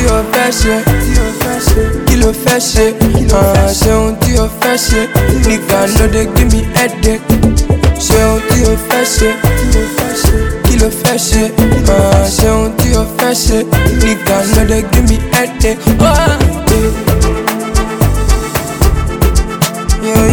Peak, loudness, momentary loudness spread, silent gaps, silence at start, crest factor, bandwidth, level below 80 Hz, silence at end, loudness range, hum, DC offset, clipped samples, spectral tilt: 0 dBFS; -11 LUFS; 4 LU; none; 0 s; 10 dB; over 20 kHz; -14 dBFS; 0 s; 1 LU; none; under 0.1%; under 0.1%; -5 dB/octave